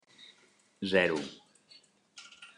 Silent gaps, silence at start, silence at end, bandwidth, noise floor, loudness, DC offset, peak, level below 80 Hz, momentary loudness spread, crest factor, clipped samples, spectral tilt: none; 0.2 s; 0.1 s; 11 kHz; -66 dBFS; -30 LUFS; under 0.1%; -12 dBFS; -76 dBFS; 27 LU; 24 dB; under 0.1%; -5 dB/octave